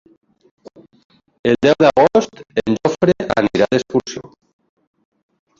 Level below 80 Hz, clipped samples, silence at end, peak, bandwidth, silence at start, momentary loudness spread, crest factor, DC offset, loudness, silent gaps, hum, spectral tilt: -50 dBFS; under 0.1%; 1.4 s; 0 dBFS; 7.6 kHz; 1.45 s; 11 LU; 18 dB; under 0.1%; -16 LUFS; none; none; -6 dB/octave